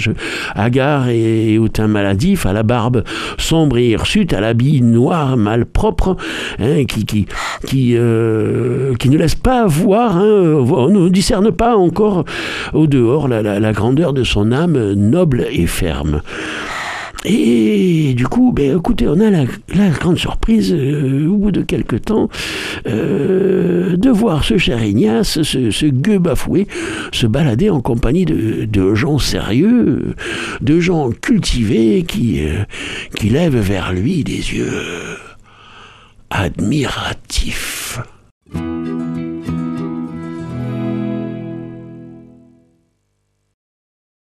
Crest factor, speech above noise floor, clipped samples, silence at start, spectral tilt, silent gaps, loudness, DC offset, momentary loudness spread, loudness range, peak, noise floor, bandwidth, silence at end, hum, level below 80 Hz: 14 dB; 52 dB; under 0.1%; 0 s; -6.5 dB/octave; 38.31-38.41 s; -15 LUFS; under 0.1%; 10 LU; 10 LU; 0 dBFS; -66 dBFS; 14.5 kHz; 2.1 s; none; -28 dBFS